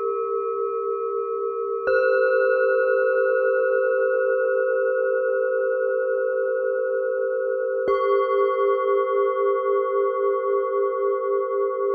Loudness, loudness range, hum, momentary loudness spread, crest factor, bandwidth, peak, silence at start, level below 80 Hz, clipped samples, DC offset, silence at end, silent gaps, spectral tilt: -22 LUFS; 2 LU; none; 6 LU; 12 dB; 4.7 kHz; -10 dBFS; 0 s; -72 dBFS; under 0.1%; under 0.1%; 0 s; none; -6.5 dB/octave